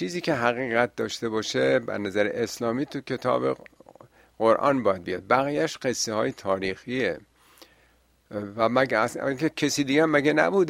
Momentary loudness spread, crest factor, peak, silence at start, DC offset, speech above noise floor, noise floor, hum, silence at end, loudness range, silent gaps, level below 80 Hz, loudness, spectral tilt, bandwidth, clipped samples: 8 LU; 22 dB; -4 dBFS; 0 s; under 0.1%; 38 dB; -62 dBFS; none; 0 s; 3 LU; none; -64 dBFS; -25 LUFS; -4.5 dB/octave; 16 kHz; under 0.1%